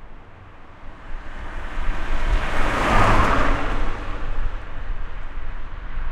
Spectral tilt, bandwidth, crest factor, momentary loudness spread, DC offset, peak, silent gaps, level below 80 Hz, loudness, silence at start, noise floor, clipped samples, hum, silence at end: -5.5 dB/octave; 9.6 kHz; 18 dB; 26 LU; under 0.1%; -4 dBFS; none; -24 dBFS; -24 LUFS; 0 s; -41 dBFS; under 0.1%; none; 0 s